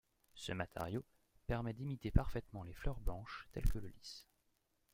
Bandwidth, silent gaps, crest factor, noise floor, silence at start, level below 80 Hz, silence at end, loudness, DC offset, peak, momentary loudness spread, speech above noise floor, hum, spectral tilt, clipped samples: 16.5 kHz; none; 28 dB; -80 dBFS; 0.35 s; -46 dBFS; 0.7 s; -44 LUFS; under 0.1%; -14 dBFS; 15 LU; 40 dB; none; -6.5 dB/octave; under 0.1%